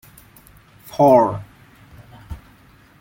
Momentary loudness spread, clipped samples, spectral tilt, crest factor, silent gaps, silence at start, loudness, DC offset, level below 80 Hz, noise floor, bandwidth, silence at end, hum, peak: 26 LU; under 0.1%; -8 dB/octave; 20 dB; none; 0.95 s; -15 LUFS; under 0.1%; -48 dBFS; -50 dBFS; 17 kHz; 0.65 s; none; -2 dBFS